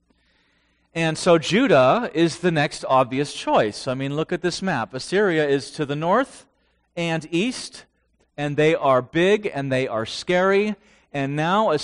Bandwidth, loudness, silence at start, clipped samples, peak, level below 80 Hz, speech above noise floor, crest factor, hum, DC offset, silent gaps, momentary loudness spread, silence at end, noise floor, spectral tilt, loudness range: 10.5 kHz; -21 LUFS; 0.95 s; under 0.1%; -6 dBFS; -58 dBFS; 44 dB; 16 dB; none; under 0.1%; none; 10 LU; 0 s; -64 dBFS; -5.5 dB/octave; 4 LU